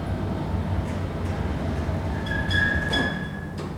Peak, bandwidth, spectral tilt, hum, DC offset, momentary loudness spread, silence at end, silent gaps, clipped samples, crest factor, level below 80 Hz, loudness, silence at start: -10 dBFS; 13 kHz; -6 dB/octave; none; under 0.1%; 7 LU; 0 s; none; under 0.1%; 16 dB; -36 dBFS; -26 LUFS; 0 s